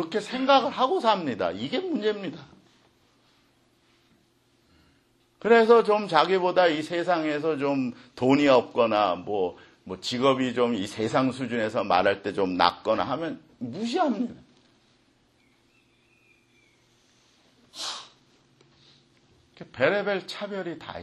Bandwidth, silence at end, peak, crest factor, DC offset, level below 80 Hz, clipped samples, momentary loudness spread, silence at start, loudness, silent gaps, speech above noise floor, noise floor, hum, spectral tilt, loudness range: 12 kHz; 0 s; -2 dBFS; 24 dB; under 0.1%; -68 dBFS; under 0.1%; 14 LU; 0 s; -25 LUFS; none; 41 dB; -65 dBFS; none; -5 dB/octave; 20 LU